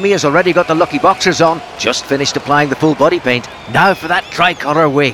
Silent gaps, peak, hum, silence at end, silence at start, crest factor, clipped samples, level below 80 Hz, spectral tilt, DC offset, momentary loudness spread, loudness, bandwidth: none; 0 dBFS; none; 0 s; 0 s; 12 dB; under 0.1%; -48 dBFS; -4.5 dB/octave; under 0.1%; 5 LU; -12 LUFS; 17.5 kHz